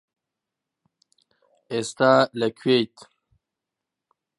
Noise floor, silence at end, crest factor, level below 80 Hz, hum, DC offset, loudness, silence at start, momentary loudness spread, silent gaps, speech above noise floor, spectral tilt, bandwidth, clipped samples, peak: -86 dBFS; 1.5 s; 24 dB; -72 dBFS; none; under 0.1%; -22 LUFS; 1.7 s; 12 LU; none; 64 dB; -5 dB/octave; 11.5 kHz; under 0.1%; -4 dBFS